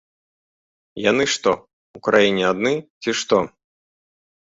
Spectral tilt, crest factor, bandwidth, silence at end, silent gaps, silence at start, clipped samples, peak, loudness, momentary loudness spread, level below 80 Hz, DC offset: -3.5 dB/octave; 20 dB; 8 kHz; 1.05 s; 1.73-1.94 s, 2.90-3.01 s; 0.95 s; under 0.1%; -2 dBFS; -20 LUFS; 11 LU; -58 dBFS; under 0.1%